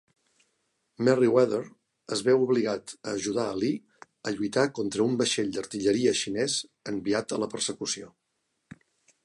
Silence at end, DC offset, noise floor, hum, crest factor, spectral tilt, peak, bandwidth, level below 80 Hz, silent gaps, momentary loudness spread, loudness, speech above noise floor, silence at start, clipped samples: 1.15 s; under 0.1%; -78 dBFS; none; 20 dB; -4 dB/octave; -8 dBFS; 11.5 kHz; -68 dBFS; none; 11 LU; -27 LUFS; 51 dB; 1 s; under 0.1%